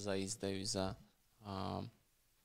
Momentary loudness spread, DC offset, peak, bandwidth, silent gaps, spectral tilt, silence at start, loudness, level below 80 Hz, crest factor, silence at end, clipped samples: 15 LU; under 0.1%; -24 dBFS; 16 kHz; none; -4 dB/octave; 0 s; -42 LUFS; -68 dBFS; 20 dB; 0 s; under 0.1%